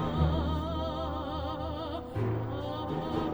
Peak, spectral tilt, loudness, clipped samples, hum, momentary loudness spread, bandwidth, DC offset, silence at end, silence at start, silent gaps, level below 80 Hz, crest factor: -16 dBFS; -8.5 dB/octave; -33 LUFS; under 0.1%; none; 7 LU; over 20 kHz; under 0.1%; 0 s; 0 s; none; -40 dBFS; 16 dB